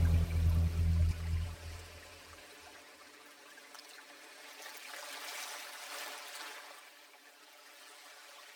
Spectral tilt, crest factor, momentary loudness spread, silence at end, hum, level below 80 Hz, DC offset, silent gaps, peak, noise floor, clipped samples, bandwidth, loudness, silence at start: -5 dB/octave; 18 dB; 22 LU; 0 s; none; -42 dBFS; under 0.1%; none; -20 dBFS; -59 dBFS; under 0.1%; 18.5 kHz; -37 LUFS; 0 s